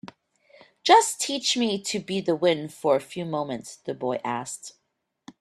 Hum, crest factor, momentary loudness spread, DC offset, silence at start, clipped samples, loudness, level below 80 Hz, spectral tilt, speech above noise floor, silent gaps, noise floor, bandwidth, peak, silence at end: none; 22 dB; 16 LU; under 0.1%; 0.05 s; under 0.1%; -24 LUFS; -72 dBFS; -3 dB/octave; 53 dB; none; -77 dBFS; 14.5 kHz; -4 dBFS; 0.7 s